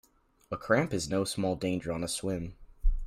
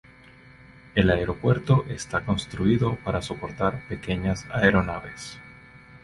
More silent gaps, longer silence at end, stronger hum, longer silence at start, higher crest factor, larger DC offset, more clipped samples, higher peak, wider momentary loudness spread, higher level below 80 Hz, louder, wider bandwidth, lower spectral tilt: neither; about the same, 0 s vs 0.05 s; neither; second, 0.5 s vs 0.95 s; about the same, 20 dB vs 22 dB; neither; neither; second, -10 dBFS vs -4 dBFS; about the same, 11 LU vs 13 LU; first, -36 dBFS vs -42 dBFS; second, -32 LUFS vs -25 LUFS; first, 15 kHz vs 11.5 kHz; second, -5 dB/octave vs -6.5 dB/octave